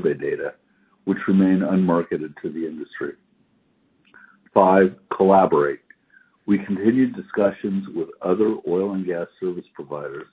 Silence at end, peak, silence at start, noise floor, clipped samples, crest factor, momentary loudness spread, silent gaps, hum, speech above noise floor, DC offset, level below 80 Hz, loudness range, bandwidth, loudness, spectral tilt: 0.1 s; 0 dBFS; 0 s; -63 dBFS; under 0.1%; 20 dB; 16 LU; none; none; 43 dB; under 0.1%; -60 dBFS; 4 LU; 4 kHz; -21 LUFS; -12 dB/octave